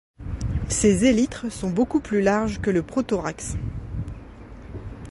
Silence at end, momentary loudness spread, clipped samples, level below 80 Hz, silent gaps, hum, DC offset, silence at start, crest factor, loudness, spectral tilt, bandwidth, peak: 0 s; 19 LU; under 0.1%; -36 dBFS; none; none; under 0.1%; 0.2 s; 18 dB; -23 LUFS; -5.5 dB/octave; 11.5 kHz; -6 dBFS